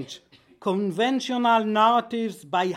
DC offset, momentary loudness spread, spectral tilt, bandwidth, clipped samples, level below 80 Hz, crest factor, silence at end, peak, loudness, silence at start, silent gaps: under 0.1%; 12 LU; -5 dB/octave; 13.5 kHz; under 0.1%; -76 dBFS; 16 dB; 0 s; -8 dBFS; -23 LUFS; 0 s; none